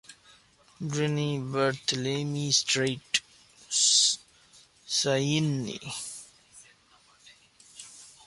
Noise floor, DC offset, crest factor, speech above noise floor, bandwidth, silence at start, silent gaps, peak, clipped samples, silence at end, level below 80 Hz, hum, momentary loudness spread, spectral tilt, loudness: -61 dBFS; under 0.1%; 22 dB; 33 dB; 11.5 kHz; 0.1 s; none; -8 dBFS; under 0.1%; 0.15 s; -68 dBFS; none; 18 LU; -3 dB/octave; -26 LUFS